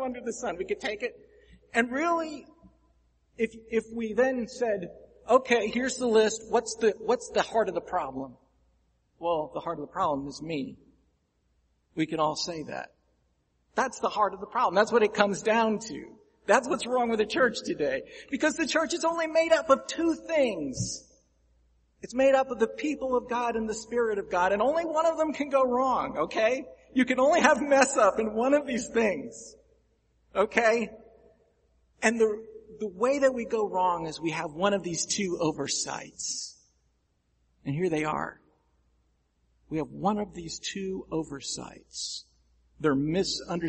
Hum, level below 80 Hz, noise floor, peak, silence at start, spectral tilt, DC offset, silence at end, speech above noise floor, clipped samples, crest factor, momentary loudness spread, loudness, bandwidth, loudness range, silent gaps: none; -60 dBFS; -72 dBFS; -4 dBFS; 0 s; -4 dB/octave; under 0.1%; 0 s; 45 dB; under 0.1%; 26 dB; 13 LU; -28 LUFS; 8.8 kHz; 9 LU; none